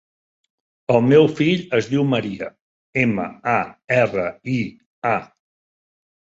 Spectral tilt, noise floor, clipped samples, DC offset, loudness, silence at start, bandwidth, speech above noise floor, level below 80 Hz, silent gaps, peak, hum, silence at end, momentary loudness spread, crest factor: -7 dB/octave; under -90 dBFS; under 0.1%; under 0.1%; -20 LUFS; 0.9 s; 7.8 kHz; over 71 dB; -58 dBFS; 2.61-2.93 s, 4.86-5.02 s; -2 dBFS; none; 1.15 s; 13 LU; 20 dB